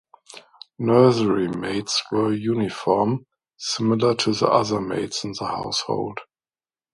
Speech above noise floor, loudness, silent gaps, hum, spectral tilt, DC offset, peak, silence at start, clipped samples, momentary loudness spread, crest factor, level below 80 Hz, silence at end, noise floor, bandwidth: over 69 dB; -22 LUFS; none; none; -5 dB/octave; under 0.1%; -2 dBFS; 0.35 s; under 0.1%; 11 LU; 22 dB; -58 dBFS; 0.7 s; under -90 dBFS; 11.5 kHz